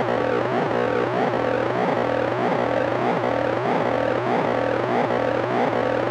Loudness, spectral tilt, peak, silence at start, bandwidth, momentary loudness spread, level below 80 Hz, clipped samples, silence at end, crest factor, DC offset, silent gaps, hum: -22 LUFS; -7 dB/octave; -10 dBFS; 0 s; 10 kHz; 1 LU; -54 dBFS; under 0.1%; 0 s; 12 dB; under 0.1%; none; none